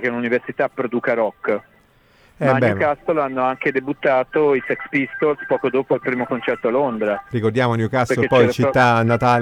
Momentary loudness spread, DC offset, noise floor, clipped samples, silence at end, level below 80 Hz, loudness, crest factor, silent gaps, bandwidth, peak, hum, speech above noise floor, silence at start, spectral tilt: 7 LU; under 0.1%; -54 dBFS; under 0.1%; 0 s; -54 dBFS; -19 LUFS; 16 dB; none; 14 kHz; -2 dBFS; none; 36 dB; 0 s; -7 dB/octave